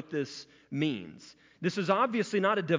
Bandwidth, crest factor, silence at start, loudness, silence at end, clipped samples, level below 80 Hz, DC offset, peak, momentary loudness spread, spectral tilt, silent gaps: 7.6 kHz; 18 dB; 0 s; -31 LUFS; 0 s; under 0.1%; -74 dBFS; under 0.1%; -12 dBFS; 13 LU; -6 dB/octave; none